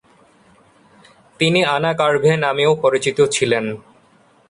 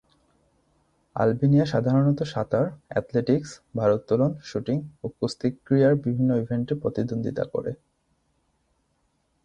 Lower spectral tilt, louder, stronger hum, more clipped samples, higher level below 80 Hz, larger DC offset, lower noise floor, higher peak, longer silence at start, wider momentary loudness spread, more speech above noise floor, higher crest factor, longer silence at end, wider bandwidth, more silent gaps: second, -4.5 dB/octave vs -8 dB/octave; first, -17 LUFS vs -25 LUFS; neither; neither; about the same, -58 dBFS vs -58 dBFS; neither; second, -54 dBFS vs -71 dBFS; first, -2 dBFS vs -8 dBFS; first, 1.4 s vs 1.15 s; second, 5 LU vs 10 LU; second, 37 dB vs 47 dB; about the same, 16 dB vs 18 dB; second, 0.7 s vs 1.7 s; first, 11.5 kHz vs 9.2 kHz; neither